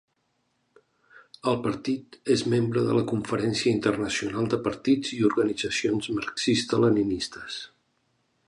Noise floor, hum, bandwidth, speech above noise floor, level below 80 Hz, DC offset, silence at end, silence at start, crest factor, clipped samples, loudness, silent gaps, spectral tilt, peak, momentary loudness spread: -73 dBFS; none; 11.5 kHz; 48 dB; -58 dBFS; under 0.1%; 0.8 s; 1.15 s; 18 dB; under 0.1%; -26 LUFS; none; -5 dB/octave; -8 dBFS; 9 LU